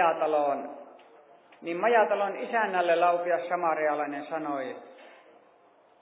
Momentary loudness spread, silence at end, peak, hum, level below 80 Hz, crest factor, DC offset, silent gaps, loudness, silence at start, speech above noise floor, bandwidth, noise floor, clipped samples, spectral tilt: 15 LU; 0.95 s; -10 dBFS; none; under -90 dBFS; 18 dB; under 0.1%; none; -27 LUFS; 0 s; 33 dB; 4 kHz; -60 dBFS; under 0.1%; -8 dB/octave